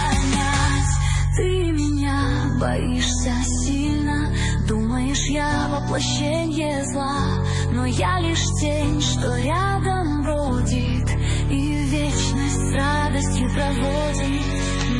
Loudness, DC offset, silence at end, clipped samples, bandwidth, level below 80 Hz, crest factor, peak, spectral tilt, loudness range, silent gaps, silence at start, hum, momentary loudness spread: -22 LUFS; under 0.1%; 0 s; under 0.1%; 11.5 kHz; -28 dBFS; 12 dB; -8 dBFS; -5 dB/octave; 1 LU; none; 0 s; none; 2 LU